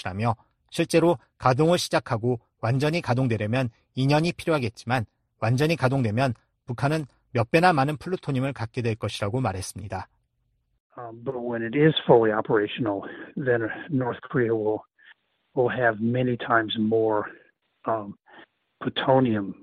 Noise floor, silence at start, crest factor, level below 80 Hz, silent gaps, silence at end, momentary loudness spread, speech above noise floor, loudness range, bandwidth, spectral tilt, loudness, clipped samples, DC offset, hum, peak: -72 dBFS; 0 s; 22 dB; -58 dBFS; 10.80-10.90 s; 0.1 s; 13 LU; 48 dB; 4 LU; 13 kHz; -6.5 dB/octave; -25 LUFS; under 0.1%; under 0.1%; none; -4 dBFS